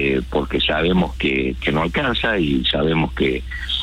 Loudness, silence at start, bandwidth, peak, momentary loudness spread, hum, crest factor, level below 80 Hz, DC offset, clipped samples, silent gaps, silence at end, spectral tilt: -19 LUFS; 0 s; 14 kHz; -8 dBFS; 4 LU; none; 12 dB; -32 dBFS; under 0.1%; under 0.1%; none; 0 s; -6.5 dB/octave